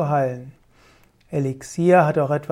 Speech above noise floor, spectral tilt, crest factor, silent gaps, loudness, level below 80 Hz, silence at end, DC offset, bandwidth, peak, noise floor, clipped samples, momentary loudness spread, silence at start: 35 dB; -7.5 dB/octave; 18 dB; none; -20 LUFS; -58 dBFS; 0.05 s; under 0.1%; 14 kHz; -4 dBFS; -54 dBFS; under 0.1%; 12 LU; 0 s